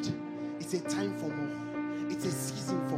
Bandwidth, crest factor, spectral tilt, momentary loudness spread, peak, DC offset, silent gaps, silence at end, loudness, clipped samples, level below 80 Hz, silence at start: 16 kHz; 14 dB; -5 dB/octave; 4 LU; -20 dBFS; under 0.1%; none; 0 s; -35 LUFS; under 0.1%; -72 dBFS; 0 s